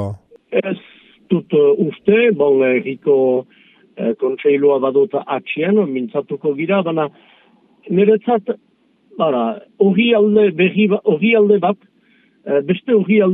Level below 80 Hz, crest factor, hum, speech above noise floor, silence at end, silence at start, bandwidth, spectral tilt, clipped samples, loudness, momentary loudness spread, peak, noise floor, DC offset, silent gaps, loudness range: -66 dBFS; 16 dB; none; 40 dB; 0 s; 0 s; 3.9 kHz; -9.5 dB/octave; under 0.1%; -16 LUFS; 10 LU; 0 dBFS; -55 dBFS; under 0.1%; none; 4 LU